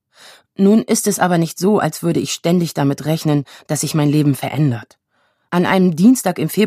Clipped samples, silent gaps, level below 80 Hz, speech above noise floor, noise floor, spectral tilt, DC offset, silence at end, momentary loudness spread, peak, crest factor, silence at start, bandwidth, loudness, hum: under 0.1%; none; -60 dBFS; 48 dB; -63 dBFS; -5.5 dB/octave; under 0.1%; 0 s; 7 LU; 0 dBFS; 16 dB; 0.6 s; 15.5 kHz; -16 LUFS; none